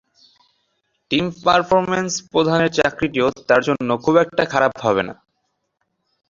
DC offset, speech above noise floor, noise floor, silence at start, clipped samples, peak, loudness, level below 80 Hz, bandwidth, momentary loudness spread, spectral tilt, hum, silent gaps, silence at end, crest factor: under 0.1%; 55 dB; -72 dBFS; 1.1 s; under 0.1%; 0 dBFS; -18 LUFS; -54 dBFS; 7.6 kHz; 5 LU; -4.5 dB/octave; none; none; 1.15 s; 20 dB